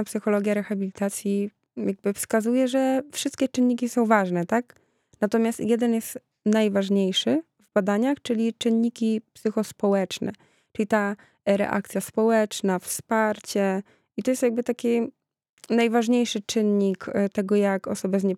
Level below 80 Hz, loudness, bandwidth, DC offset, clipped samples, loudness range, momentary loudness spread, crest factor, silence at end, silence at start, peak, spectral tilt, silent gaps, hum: -70 dBFS; -24 LUFS; 15.5 kHz; under 0.1%; under 0.1%; 2 LU; 8 LU; 20 dB; 0 s; 0 s; -4 dBFS; -5 dB/octave; 15.49-15.57 s; none